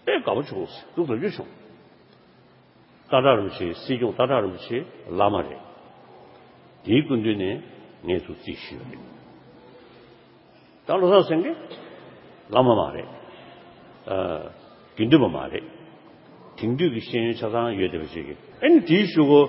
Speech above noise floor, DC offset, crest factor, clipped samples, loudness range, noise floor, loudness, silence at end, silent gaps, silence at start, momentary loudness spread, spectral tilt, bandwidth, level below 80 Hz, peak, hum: 32 dB; under 0.1%; 24 dB; under 0.1%; 4 LU; -54 dBFS; -23 LUFS; 0 s; none; 0.05 s; 22 LU; -11 dB/octave; 5.8 kHz; -56 dBFS; -2 dBFS; none